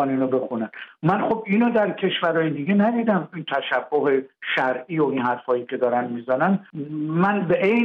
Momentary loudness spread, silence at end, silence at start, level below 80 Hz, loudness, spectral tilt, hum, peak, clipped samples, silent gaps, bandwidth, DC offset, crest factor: 6 LU; 0 s; 0 s; -68 dBFS; -22 LUFS; -8.5 dB/octave; none; -8 dBFS; under 0.1%; none; 5.6 kHz; under 0.1%; 14 dB